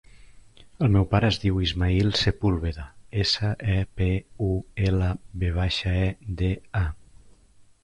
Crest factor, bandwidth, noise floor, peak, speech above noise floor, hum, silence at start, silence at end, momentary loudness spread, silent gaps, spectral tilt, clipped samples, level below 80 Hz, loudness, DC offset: 16 dB; 10 kHz; -55 dBFS; -8 dBFS; 31 dB; none; 0.3 s; 0.85 s; 7 LU; none; -6.5 dB/octave; under 0.1%; -34 dBFS; -25 LUFS; under 0.1%